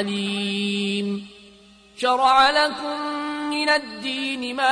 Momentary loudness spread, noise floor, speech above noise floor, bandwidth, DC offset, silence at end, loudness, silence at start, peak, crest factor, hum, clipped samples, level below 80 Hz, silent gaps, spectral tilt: 12 LU; -50 dBFS; 28 dB; 10.5 kHz; under 0.1%; 0 s; -22 LUFS; 0 s; -6 dBFS; 16 dB; none; under 0.1%; -62 dBFS; none; -4 dB/octave